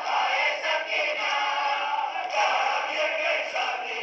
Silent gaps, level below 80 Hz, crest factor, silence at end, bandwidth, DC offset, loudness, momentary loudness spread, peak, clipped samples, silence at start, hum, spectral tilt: none; -82 dBFS; 14 dB; 0 s; 8 kHz; under 0.1%; -25 LUFS; 4 LU; -12 dBFS; under 0.1%; 0 s; none; 1 dB/octave